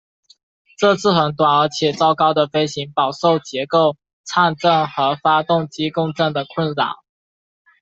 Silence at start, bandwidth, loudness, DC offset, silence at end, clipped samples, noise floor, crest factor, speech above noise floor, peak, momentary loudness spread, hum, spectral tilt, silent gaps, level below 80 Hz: 0.8 s; 8.2 kHz; -18 LUFS; under 0.1%; 0.85 s; under 0.1%; under -90 dBFS; 16 dB; over 73 dB; -2 dBFS; 7 LU; none; -5 dB/octave; 4.13-4.24 s; -60 dBFS